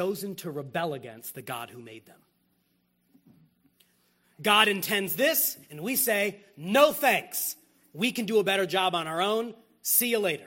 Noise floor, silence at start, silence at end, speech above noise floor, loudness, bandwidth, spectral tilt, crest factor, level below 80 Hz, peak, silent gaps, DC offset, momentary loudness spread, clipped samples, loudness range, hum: -72 dBFS; 0 s; 0 s; 44 dB; -26 LUFS; 16.5 kHz; -2.5 dB/octave; 24 dB; -76 dBFS; -6 dBFS; none; under 0.1%; 17 LU; under 0.1%; 15 LU; 60 Hz at -65 dBFS